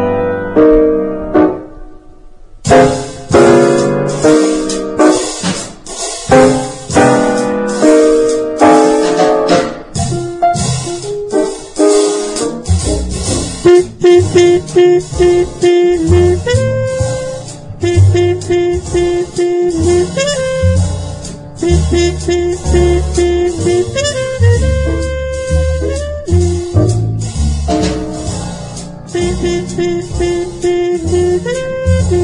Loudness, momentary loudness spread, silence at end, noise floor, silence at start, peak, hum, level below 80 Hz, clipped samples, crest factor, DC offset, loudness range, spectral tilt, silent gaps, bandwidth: -12 LUFS; 10 LU; 0 s; -34 dBFS; 0 s; 0 dBFS; none; -26 dBFS; 0.2%; 12 dB; under 0.1%; 5 LU; -6 dB/octave; none; 11 kHz